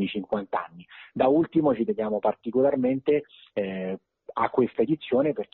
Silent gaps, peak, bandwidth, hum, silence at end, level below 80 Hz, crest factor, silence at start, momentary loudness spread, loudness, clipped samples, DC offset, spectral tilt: none; -8 dBFS; 4.2 kHz; none; 0.1 s; -64 dBFS; 16 dB; 0 s; 12 LU; -26 LUFS; under 0.1%; under 0.1%; -6 dB/octave